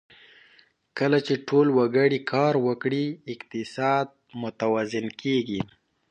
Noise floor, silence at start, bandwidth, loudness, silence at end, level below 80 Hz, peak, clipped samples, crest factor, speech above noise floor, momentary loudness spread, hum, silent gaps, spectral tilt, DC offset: -60 dBFS; 0.95 s; 9.2 kHz; -25 LUFS; 0.45 s; -66 dBFS; -8 dBFS; under 0.1%; 18 dB; 35 dB; 14 LU; none; none; -6.5 dB/octave; under 0.1%